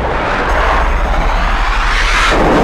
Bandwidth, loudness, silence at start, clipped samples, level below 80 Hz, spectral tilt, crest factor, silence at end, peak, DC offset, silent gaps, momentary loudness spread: 12 kHz; -13 LUFS; 0 s; under 0.1%; -16 dBFS; -4.5 dB/octave; 8 dB; 0 s; -4 dBFS; under 0.1%; none; 5 LU